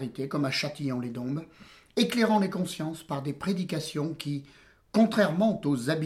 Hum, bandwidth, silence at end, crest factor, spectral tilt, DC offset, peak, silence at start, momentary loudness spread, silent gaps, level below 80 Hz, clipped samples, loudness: none; 15 kHz; 0 s; 16 dB; -6 dB/octave; under 0.1%; -12 dBFS; 0 s; 11 LU; none; -64 dBFS; under 0.1%; -29 LUFS